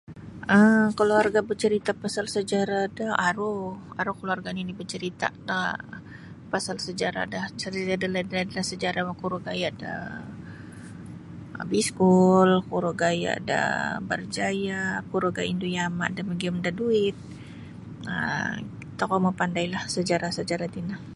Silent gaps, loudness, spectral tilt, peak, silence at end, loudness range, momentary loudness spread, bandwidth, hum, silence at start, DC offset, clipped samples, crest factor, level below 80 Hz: none; -26 LUFS; -5 dB/octave; -8 dBFS; 0 s; 7 LU; 20 LU; 11.5 kHz; none; 0.1 s; under 0.1%; under 0.1%; 20 dB; -56 dBFS